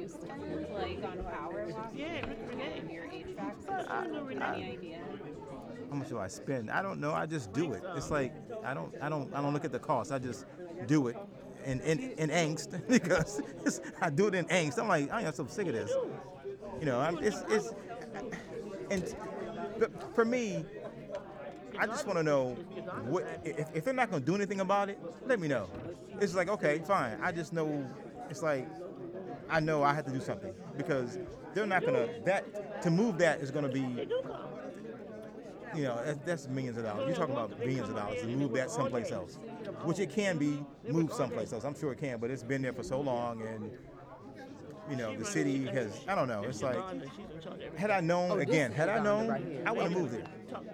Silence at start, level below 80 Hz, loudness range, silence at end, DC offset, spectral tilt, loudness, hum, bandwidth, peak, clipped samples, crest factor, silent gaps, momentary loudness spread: 0 s; -62 dBFS; 6 LU; 0 s; under 0.1%; -5.5 dB/octave; -35 LUFS; none; 15 kHz; -14 dBFS; under 0.1%; 22 dB; none; 14 LU